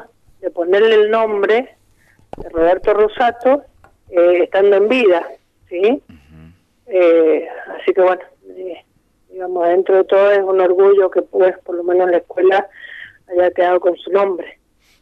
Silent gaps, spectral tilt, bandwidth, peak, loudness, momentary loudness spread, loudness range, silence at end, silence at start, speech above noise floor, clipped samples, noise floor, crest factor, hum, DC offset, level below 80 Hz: none; -6 dB/octave; 5.8 kHz; -2 dBFS; -14 LUFS; 17 LU; 3 LU; 0.5 s; 0 s; 43 dB; under 0.1%; -57 dBFS; 12 dB; none; under 0.1%; -50 dBFS